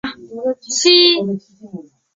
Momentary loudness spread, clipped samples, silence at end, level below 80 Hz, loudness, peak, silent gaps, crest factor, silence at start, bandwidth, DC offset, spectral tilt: 23 LU; under 0.1%; 0.35 s; -60 dBFS; -13 LUFS; 0 dBFS; none; 16 dB; 0.05 s; 7.8 kHz; under 0.1%; -2.5 dB/octave